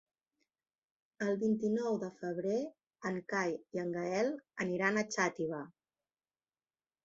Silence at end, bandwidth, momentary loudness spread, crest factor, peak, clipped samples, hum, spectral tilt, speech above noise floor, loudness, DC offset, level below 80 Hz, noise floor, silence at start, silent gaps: 1.35 s; 7.6 kHz; 8 LU; 22 dB; -16 dBFS; under 0.1%; none; -5 dB/octave; over 55 dB; -36 LUFS; under 0.1%; -80 dBFS; under -90 dBFS; 1.2 s; none